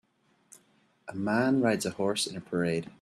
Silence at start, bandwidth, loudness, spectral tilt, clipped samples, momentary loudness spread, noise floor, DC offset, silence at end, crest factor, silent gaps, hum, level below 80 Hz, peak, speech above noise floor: 1.05 s; 13.5 kHz; -29 LUFS; -4.5 dB/octave; under 0.1%; 10 LU; -67 dBFS; under 0.1%; 0.1 s; 20 dB; none; none; -68 dBFS; -12 dBFS; 38 dB